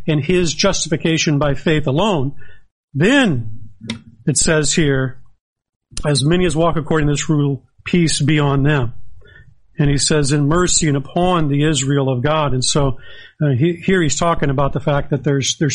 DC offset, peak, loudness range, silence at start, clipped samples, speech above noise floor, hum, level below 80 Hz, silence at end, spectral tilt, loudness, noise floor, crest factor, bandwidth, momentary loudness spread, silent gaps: under 0.1%; -2 dBFS; 2 LU; 0 s; under 0.1%; 30 dB; none; -32 dBFS; 0 s; -4.5 dB/octave; -16 LUFS; -46 dBFS; 16 dB; 11.5 kHz; 10 LU; 2.72-2.88 s, 5.40-5.56 s, 5.76-5.80 s